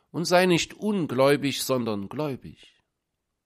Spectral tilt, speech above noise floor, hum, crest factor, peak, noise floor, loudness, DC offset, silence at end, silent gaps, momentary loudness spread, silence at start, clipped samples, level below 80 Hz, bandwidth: -4.5 dB/octave; 56 dB; none; 18 dB; -8 dBFS; -81 dBFS; -24 LUFS; under 0.1%; 0.95 s; none; 11 LU; 0.15 s; under 0.1%; -62 dBFS; 15.5 kHz